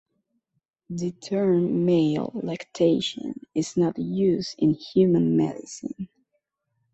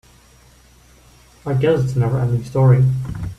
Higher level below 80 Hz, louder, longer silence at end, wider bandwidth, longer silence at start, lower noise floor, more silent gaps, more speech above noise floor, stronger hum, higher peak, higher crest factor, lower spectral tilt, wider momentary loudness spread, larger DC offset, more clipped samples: second, -62 dBFS vs -42 dBFS; second, -24 LUFS vs -17 LUFS; first, 0.9 s vs 0.05 s; about the same, 8.2 kHz vs 8.2 kHz; second, 0.9 s vs 1.45 s; first, -77 dBFS vs -49 dBFS; neither; first, 54 dB vs 33 dB; neither; second, -8 dBFS vs -4 dBFS; about the same, 16 dB vs 16 dB; second, -7 dB/octave vs -8.5 dB/octave; first, 14 LU vs 10 LU; neither; neither